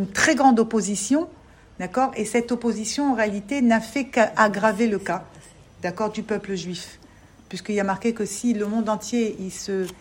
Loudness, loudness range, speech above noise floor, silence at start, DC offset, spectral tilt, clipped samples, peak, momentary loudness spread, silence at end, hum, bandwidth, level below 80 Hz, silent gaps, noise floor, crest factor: -23 LUFS; 6 LU; 27 dB; 0 s; under 0.1%; -4.5 dB/octave; under 0.1%; -2 dBFS; 13 LU; 0.05 s; none; 16.5 kHz; -56 dBFS; none; -50 dBFS; 22 dB